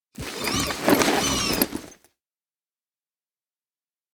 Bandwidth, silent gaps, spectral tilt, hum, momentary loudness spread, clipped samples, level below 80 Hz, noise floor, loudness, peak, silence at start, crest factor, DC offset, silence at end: over 20 kHz; none; -3 dB/octave; none; 11 LU; under 0.1%; -46 dBFS; under -90 dBFS; -22 LUFS; 0 dBFS; 0.2 s; 28 dB; under 0.1%; 2.2 s